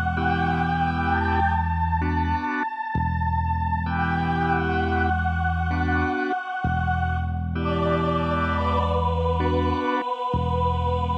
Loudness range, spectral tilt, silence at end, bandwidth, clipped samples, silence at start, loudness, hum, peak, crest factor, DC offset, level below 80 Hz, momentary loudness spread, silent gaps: 1 LU; -8 dB/octave; 0 s; 6.2 kHz; under 0.1%; 0 s; -24 LUFS; none; -10 dBFS; 14 dB; under 0.1%; -32 dBFS; 3 LU; none